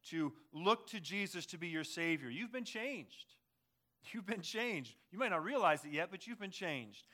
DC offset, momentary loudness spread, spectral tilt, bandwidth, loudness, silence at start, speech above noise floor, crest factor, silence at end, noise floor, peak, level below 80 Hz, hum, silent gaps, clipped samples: under 0.1%; 14 LU; -4 dB/octave; 17 kHz; -40 LUFS; 0.05 s; 43 dB; 22 dB; 0.15 s; -84 dBFS; -20 dBFS; under -90 dBFS; none; none; under 0.1%